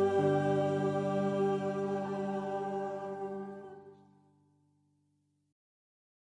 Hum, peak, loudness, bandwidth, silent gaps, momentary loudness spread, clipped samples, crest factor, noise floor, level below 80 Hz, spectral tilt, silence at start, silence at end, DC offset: none; -18 dBFS; -33 LUFS; 10 kHz; none; 14 LU; under 0.1%; 18 dB; -76 dBFS; -78 dBFS; -8 dB/octave; 0 s; 2.45 s; under 0.1%